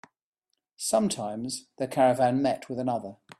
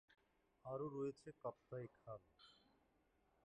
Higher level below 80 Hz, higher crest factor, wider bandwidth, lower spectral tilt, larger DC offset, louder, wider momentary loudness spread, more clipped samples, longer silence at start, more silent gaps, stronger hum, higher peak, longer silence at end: first, -68 dBFS vs -82 dBFS; about the same, 18 dB vs 18 dB; first, 14 kHz vs 9 kHz; second, -4.5 dB/octave vs -8 dB/octave; neither; first, -27 LUFS vs -52 LUFS; second, 11 LU vs 20 LU; neither; first, 0.8 s vs 0.1 s; neither; neither; first, -10 dBFS vs -36 dBFS; second, 0.25 s vs 0.9 s